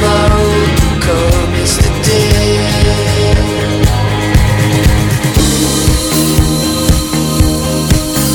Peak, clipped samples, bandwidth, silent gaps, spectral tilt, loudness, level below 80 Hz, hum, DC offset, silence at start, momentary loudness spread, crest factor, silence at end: 0 dBFS; 0.2%; over 20 kHz; none; -4.5 dB/octave; -11 LUFS; -16 dBFS; none; under 0.1%; 0 s; 2 LU; 10 dB; 0 s